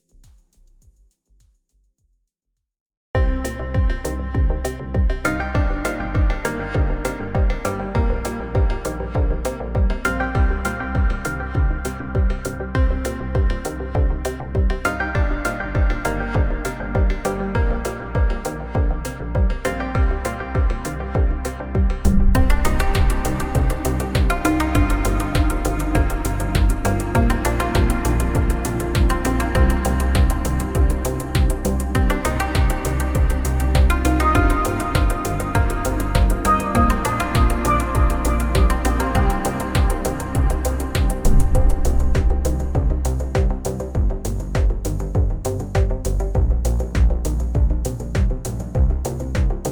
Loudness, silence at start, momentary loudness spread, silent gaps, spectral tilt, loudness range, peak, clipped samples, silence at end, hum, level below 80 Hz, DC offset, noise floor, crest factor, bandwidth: -21 LUFS; 3.15 s; 6 LU; none; -6 dB/octave; 4 LU; -2 dBFS; under 0.1%; 0 s; none; -22 dBFS; under 0.1%; -78 dBFS; 16 dB; over 20 kHz